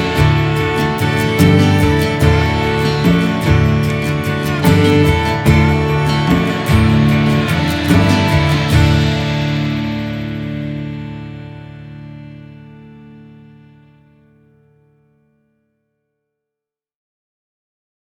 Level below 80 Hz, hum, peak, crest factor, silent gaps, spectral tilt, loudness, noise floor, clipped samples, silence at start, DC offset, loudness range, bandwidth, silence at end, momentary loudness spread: -28 dBFS; none; 0 dBFS; 16 dB; none; -6.5 dB/octave; -14 LUFS; -85 dBFS; under 0.1%; 0 s; under 0.1%; 14 LU; 18 kHz; 4.9 s; 16 LU